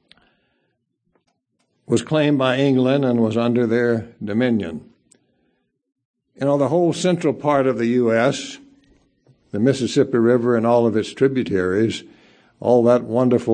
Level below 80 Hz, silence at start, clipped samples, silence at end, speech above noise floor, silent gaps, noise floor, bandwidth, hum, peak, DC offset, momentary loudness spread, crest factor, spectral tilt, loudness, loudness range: -62 dBFS; 1.9 s; under 0.1%; 0 s; 53 dB; 6.05-6.14 s; -71 dBFS; 9.8 kHz; none; -2 dBFS; under 0.1%; 8 LU; 18 dB; -6.5 dB/octave; -19 LUFS; 4 LU